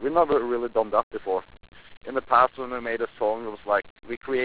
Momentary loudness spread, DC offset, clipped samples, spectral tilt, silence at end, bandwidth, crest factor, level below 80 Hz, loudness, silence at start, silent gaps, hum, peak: 11 LU; 0.4%; under 0.1%; -8.5 dB/octave; 0 s; 4 kHz; 20 dB; -56 dBFS; -25 LUFS; 0 s; 1.03-1.11 s, 1.97-2.01 s, 3.90-3.96 s, 4.17-4.21 s; none; -6 dBFS